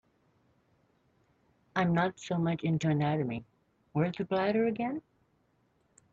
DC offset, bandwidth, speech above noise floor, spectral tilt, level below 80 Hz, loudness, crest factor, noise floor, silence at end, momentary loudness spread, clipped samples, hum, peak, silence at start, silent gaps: under 0.1%; 7.8 kHz; 42 dB; -7.5 dB/octave; -68 dBFS; -31 LUFS; 20 dB; -72 dBFS; 1.1 s; 8 LU; under 0.1%; none; -12 dBFS; 1.75 s; none